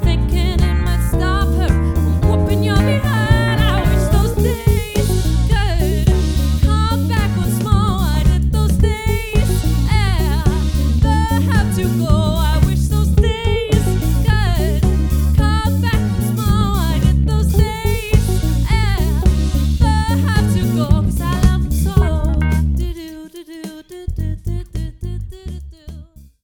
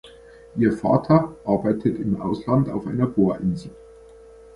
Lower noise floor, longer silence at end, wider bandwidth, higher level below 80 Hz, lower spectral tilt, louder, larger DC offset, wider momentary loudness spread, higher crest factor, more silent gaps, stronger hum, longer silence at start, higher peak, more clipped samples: second, -38 dBFS vs -46 dBFS; second, 0.4 s vs 0.75 s; first, 19.5 kHz vs 11 kHz; first, -18 dBFS vs -48 dBFS; second, -6.5 dB/octave vs -9.5 dB/octave; first, -16 LUFS vs -22 LUFS; neither; about the same, 10 LU vs 8 LU; second, 14 dB vs 20 dB; neither; neither; about the same, 0 s vs 0.05 s; about the same, 0 dBFS vs -2 dBFS; neither